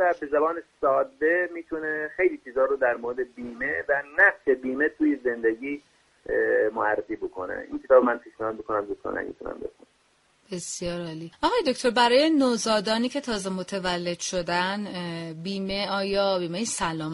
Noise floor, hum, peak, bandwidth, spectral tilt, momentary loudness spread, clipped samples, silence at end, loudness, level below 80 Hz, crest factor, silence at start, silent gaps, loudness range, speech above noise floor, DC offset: -65 dBFS; none; -6 dBFS; 11.5 kHz; -4 dB/octave; 14 LU; under 0.1%; 0 s; -25 LUFS; -56 dBFS; 20 dB; 0 s; none; 4 LU; 39 dB; under 0.1%